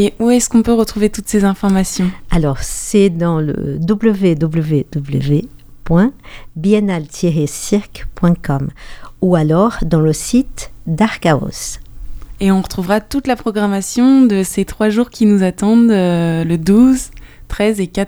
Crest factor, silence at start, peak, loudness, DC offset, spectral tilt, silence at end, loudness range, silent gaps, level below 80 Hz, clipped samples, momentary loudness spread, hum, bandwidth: 14 dB; 0 s; 0 dBFS; -14 LUFS; under 0.1%; -6 dB/octave; 0 s; 4 LU; none; -32 dBFS; under 0.1%; 8 LU; none; over 20 kHz